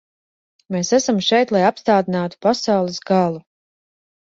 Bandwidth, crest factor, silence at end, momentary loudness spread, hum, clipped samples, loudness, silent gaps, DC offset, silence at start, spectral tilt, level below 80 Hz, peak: 8 kHz; 18 dB; 0.9 s; 7 LU; none; under 0.1%; -18 LUFS; none; under 0.1%; 0.7 s; -4.5 dB/octave; -62 dBFS; -2 dBFS